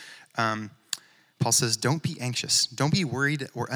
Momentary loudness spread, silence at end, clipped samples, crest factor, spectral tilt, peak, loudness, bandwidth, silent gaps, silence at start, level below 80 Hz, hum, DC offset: 13 LU; 0 s; under 0.1%; 22 dB; -3 dB/octave; -6 dBFS; -26 LUFS; over 20 kHz; none; 0 s; -70 dBFS; none; under 0.1%